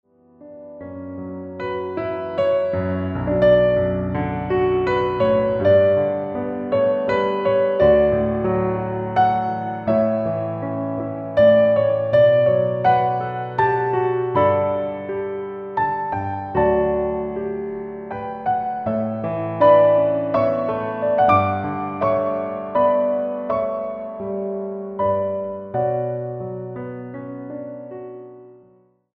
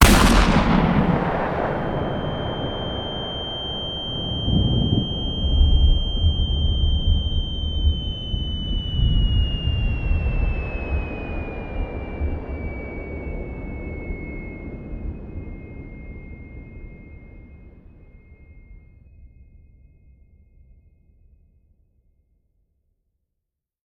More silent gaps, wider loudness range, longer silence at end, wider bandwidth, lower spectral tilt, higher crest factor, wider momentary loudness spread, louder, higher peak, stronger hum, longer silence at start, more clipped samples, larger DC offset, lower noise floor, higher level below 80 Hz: neither; second, 7 LU vs 17 LU; second, 0.65 s vs 4.3 s; second, 4.9 kHz vs 16.5 kHz; first, -9.5 dB/octave vs -5.5 dB/octave; second, 16 dB vs 22 dB; second, 15 LU vs 19 LU; first, -20 LUFS vs -23 LUFS; second, -4 dBFS vs 0 dBFS; neither; first, 0.4 s vs 0 s; neither; neither; second, -56 dBFS vs -82 dBFS; second, -46 dBFS vs -26 dBFS